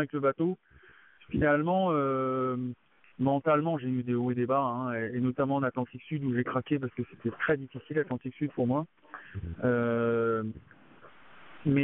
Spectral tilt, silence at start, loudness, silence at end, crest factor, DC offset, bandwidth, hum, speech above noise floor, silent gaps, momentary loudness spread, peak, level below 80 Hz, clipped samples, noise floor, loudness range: -7 dB/octave; 0 s; -30 LUFS; 0 s; 18 dB; under 0.1%; 3.9 kHz; none; 28 dB; none; 10 LU; -12 dBFS; -60 dBFS; under 0.1%; -58 dBFS; 3 LU